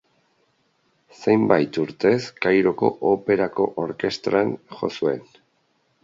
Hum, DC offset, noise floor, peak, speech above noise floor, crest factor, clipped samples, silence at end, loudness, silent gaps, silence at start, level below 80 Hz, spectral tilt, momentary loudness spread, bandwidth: none; under 0.1%; -67 dBFS; -2 dBFS; 46 dB; 22 dB; under 0.1%; 0.8 s; -22 LUFS; none; 1.2 s; -62 dBFS; -6.5 dB/octave; 8 LU; 7.6 kHz